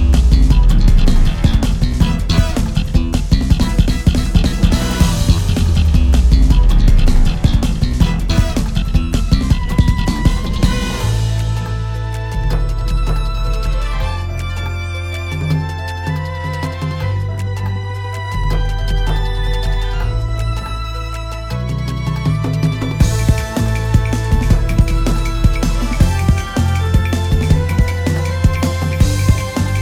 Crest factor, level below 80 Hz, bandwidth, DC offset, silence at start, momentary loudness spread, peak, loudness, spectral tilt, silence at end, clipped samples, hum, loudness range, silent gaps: 14 dB; -16 dBFS; 15 kHz; under 0.1%; 0 s; 8 LU; 0 dBFS; -17 LUFS; -6 dB/octave; 0 s; under 0.1%; none; 6 LU; none